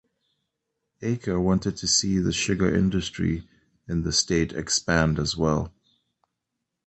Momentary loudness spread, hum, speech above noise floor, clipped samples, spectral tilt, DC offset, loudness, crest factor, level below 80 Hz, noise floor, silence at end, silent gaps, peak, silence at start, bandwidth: 8 LU; none; 58 dB; under 0.1%; -4 dB/octave; under 0.1%; -24 LUFS; 20 dB; -42 dBFS; -82 dBFS; 1.2 s; none; -6 dBFS; 1 s; 8.8 kHz